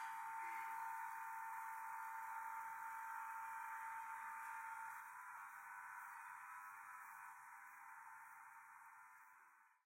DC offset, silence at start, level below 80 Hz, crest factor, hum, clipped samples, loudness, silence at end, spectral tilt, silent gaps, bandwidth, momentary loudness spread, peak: under 0.1%; 0 s; under -90 dBFS; 14 dB; none; under 0.1%; -52 LUFS; 0.1 s; 0.5 dB/octave; none; 16.5 kHz; 12 LU; -38 dBFS